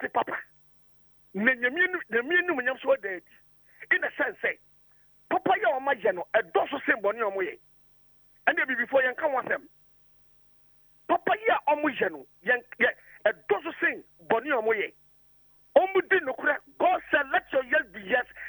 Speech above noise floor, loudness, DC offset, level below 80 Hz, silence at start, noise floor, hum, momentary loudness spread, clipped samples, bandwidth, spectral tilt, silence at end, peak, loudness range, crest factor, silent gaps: 33 dB; -27 LUFS; under 0.1%; -70 dBFS; 0 s; -60 dBFS; none; 7 LU; under 0.1%; over 20 kHz; -6.5 dB/octave; 0 s; -6 dBFS; 3 LU; 22 dB; none